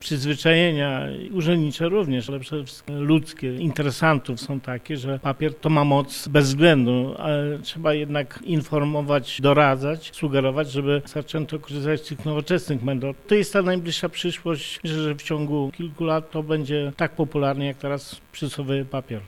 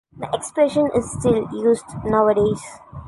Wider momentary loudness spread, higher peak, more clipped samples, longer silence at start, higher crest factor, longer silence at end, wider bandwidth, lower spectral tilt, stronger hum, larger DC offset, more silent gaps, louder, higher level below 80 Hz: about the same, 11 LU vs 10 LU; about the same, -4 dBFS vs -4 dBFS; neither; second, 0 s vs 0.15 s; about the same, 20 dB vs 16 dB; about the same, 0 s vs 0 s; first, 15.5 kHz vs 11.5 kHz; about the same, -6 dB/octave vs -6 dB/octave; neither; neither; neither; second, -23 LUFS vs -20 LUFS; second, -54 dBFS vs -44 dBFS